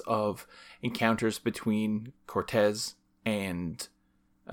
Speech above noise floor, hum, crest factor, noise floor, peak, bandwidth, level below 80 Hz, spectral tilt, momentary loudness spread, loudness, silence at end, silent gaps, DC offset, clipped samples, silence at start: 38 dB; none; 20 dB; -69 dBFS; -10 dBFS; 18.5 kHz; -62 dBFS; -5 dB/octave; 11 LU; -31 LUFS; 0 s; none; under 0.1%; under 0.1%; 0 s